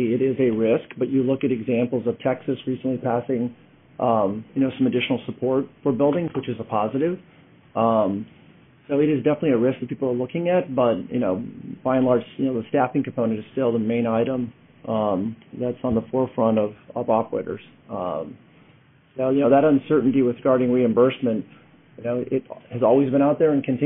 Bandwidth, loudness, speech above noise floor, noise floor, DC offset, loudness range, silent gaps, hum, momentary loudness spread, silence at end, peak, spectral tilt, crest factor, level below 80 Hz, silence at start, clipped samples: 3.8 kHz; -22 LUFS; 33 dB; -54 dBFS; under 0.1%; 4 LU; none; none; 11 LU; 0 s; -4 dBFS; -5.5 dB/octave; 18 dB; -60 dBFS; 0 s; under 0.1%